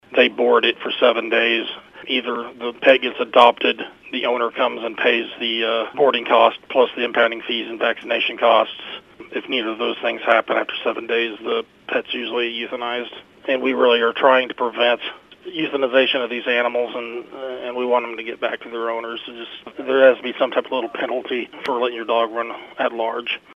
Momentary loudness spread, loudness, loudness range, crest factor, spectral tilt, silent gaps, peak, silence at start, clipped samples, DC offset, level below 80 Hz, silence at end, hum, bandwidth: 14 LU; -19 LUFS; 4 LU; 20 dB; -4.5 dB/octave; none; 0 dBFS; 0.1 s; under 0.1%; under 0.1%; -68 dBFS; 0 s; none; 6.6 kHz